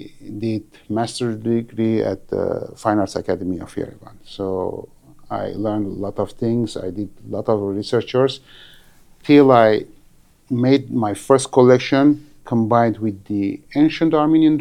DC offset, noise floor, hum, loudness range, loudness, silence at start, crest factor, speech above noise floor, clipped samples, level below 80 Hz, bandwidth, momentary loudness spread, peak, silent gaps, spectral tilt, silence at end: under 0.1%; -51 dBFS; none; 9 LU; -19 LUFS; 0 s; 18 dB; 33 dB; under 0.1%; -50 dBFS; 11.5 kHz; 15 LU; 0 dBFS; none; -6.5 dB/octave; 0 s